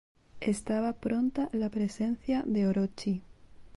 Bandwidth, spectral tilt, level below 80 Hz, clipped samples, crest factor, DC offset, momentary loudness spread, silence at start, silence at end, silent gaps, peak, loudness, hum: 11.5 kHz; -7 dB/octave; -58 dBFS; under 0.1%; 14 dB; under 0.1%; 6 LU; 0.35 s; 0.1 s; none; -18 dBFS; -31 LUFS; none